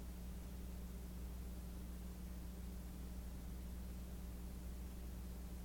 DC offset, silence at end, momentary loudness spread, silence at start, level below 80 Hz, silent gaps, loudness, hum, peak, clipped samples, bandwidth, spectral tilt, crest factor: under 0.1%; 0 s; 1 LU; 0 s; -50 dBFS; none; -52 LUFS; none; -40 dBFS; under 0.1%; 17.5 kHz; -6 dB/octave; 10 dB